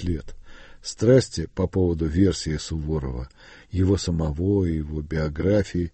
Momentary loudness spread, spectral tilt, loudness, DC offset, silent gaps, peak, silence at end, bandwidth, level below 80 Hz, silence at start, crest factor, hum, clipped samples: 13 LU; -6.5 dB/octave; -24 LUFS; under 0.1%; none; -6 dBFS; 0.05 s; 8.8 kHz; -36 dBFS; 0 s; 18 dB; none; under 0.1%